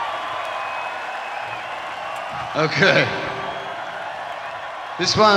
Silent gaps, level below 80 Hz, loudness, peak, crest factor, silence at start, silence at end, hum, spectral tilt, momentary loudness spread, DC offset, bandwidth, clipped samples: none; -56 dBFS; -23 LUFS; 0 dBFS; 22 dB; 0 s; 0 s; none; -3.5 dB/octave; 14 LU; under 0.1%; 14 kHz; under 0.1%